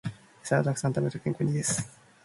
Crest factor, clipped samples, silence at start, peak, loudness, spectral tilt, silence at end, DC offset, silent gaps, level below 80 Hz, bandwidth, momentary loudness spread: 20 dB; under 0.1%; 0.05 s; -10 dBFS; -29 LUFS; -5.5 dB/octave; 0.35 s; under 0.1%; none; -62 dBFS; 11.5 kHz; 14 LU